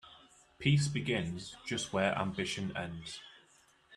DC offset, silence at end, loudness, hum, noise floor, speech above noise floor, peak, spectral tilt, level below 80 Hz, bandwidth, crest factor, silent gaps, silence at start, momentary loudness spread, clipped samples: under 0.1%; 0 s; -34 LUFS; none; -66 dBFS; 32 dB; -14 dBFS; -5 dB/octave; -62 dBFS; 12 kHz; 22 dB; none; 0.05 s; 14 LU; under 0.1%